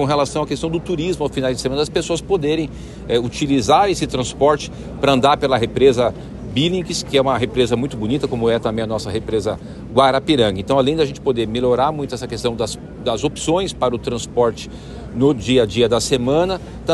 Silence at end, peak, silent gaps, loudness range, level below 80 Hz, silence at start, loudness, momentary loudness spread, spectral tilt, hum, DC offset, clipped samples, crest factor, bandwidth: 0 s; 0 dBFS; none; 4 LU; -38 dBFS; 0 s; -18 LUFS; 9 LU; -5 dB/octave; none; under 0.1%; under 0.1%; 18 dB; 12.5 kHz